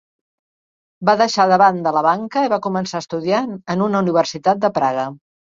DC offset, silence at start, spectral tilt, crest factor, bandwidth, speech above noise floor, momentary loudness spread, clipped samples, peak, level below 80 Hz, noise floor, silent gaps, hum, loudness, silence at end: under 0.1%; 1 s; -5.5 dB/octave; 16 dB; 7.6 kHz; over 73 dB; 9 LU; under 0.1%; -2 dBFS; -62 dBFS; under -90 dBFS; none; none; -17 LUFS; 0.3 s